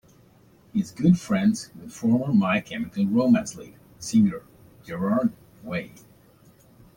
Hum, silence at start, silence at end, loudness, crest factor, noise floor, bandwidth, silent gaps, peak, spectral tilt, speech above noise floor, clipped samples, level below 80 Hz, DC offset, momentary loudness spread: none; 0.75 s; 1.1 s; -24 LUFS; 18 dB; -55 dBFS; 17 kHz; none; -8 dBFS; -6.5 dB/octave; 32 dB; under 0.1%; -58 dBFS; under 0.1%; 17 LU